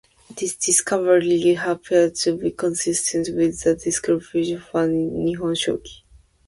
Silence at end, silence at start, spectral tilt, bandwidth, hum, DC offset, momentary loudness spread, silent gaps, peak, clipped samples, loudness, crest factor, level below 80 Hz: 0.5 s; 0.3 s; -3.5 dB/octave; 11.5 kHz; none; under 0.1%; 7 LU; none; -4 dBFS; under 0.1%; -21 LUFS; 16 dB; -52 dBFS